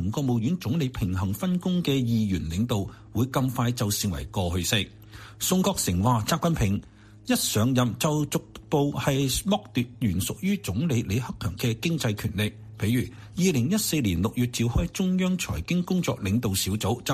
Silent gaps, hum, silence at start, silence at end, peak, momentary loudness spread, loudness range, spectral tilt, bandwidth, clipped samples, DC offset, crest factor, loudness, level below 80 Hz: none; none; 0 s; 0 s; -8 dBFS; 6 LU; 2 LU; -5 dB/octave; 15.5 kHz; under 0.1%; under 0.1%; 18 dB; -26 LUFS; -44 dBFS